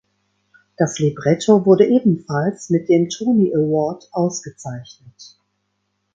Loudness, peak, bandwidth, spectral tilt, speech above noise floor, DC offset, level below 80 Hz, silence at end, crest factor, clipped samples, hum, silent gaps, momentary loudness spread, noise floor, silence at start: -17 LUFS; 0 dBFS; 9 kHz; -6.5 dB/octave; 54 dB; under 0.1%; -60 dBFS; 0.9 s; 18 dB; under 0.1%; none; none; 15 LU; -71 dBFS; 0.8 s